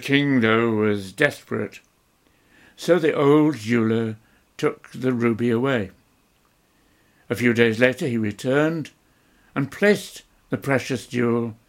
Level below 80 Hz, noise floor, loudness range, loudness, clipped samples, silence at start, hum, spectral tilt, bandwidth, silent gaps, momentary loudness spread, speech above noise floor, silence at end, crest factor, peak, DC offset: -62 dBFS; -62 dBFS; 3 LU; -22 LUFS; under 0.1%; 0 s; none; -6 dB/octave; 16.5 kHz; none; 13 LU; 41 dB; 0.15 s; 20 dB; -2 dBFS; under 0.1%